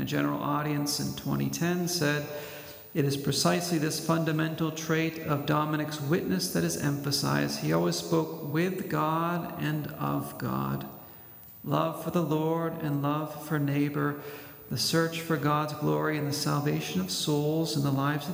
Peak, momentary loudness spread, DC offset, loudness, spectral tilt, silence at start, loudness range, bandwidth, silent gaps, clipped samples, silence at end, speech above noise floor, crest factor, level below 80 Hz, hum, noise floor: -12 dBFS; 6 LU; under 0.1%; -29 LUFS; -5 dB/octave; 0 s; 3 LU; 16.5 kHz; none; under 0.1%; 0 s; 20 dB; 18 dB; -64 dBFS; none; -49 dBFS